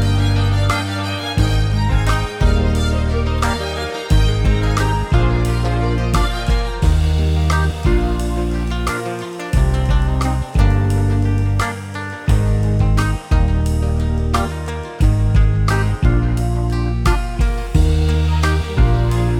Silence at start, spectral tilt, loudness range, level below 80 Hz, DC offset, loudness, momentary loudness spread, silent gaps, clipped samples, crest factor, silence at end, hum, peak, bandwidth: 0 s; -6.5 dB/octave; 1 LU; -18 dBFS; under 0.1%; -18 LUFS; 5 LU; none; under 0.1%; 14 dB; 0 s; none; -2 dBFS; 13.5 kHz